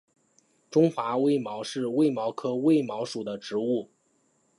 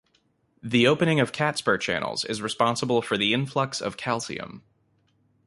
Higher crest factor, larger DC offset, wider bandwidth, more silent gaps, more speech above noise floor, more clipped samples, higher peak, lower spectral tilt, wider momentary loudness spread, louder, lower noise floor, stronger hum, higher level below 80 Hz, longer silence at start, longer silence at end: about the same, 18 dB vs 20 dB; neither; about the same, 11.5 kHz vs 11.5 kHz; neither; about the same, 43 dB vs 43 dB; neither; second, -10 dBFS vs -6 dBFS; first, -6.5 dB/octave vs -4.5 dB/octave; about the same, 9 LU vs 9 LU; second, -27 LUFS vs -24 LUFS; about the same, -69 dBFS vs -68 dBFS; neither; second, -80 dBFS vs -62 dBFS; about the same, 0.7 s vs 0.65 s; second, 0.75 s vs 0.9 s